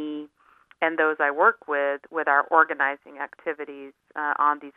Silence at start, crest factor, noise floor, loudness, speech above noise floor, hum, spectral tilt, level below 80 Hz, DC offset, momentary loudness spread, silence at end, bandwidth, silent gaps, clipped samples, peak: 0 s; 22 dB; -58 dBFS; -23 LUFS; 34 dB; none; -6 dB/octave; -82 dBFS; under 0.1%; 16 LU; 0.05 s; 3.9 kHz; none; under 0.1%; -4 dBFS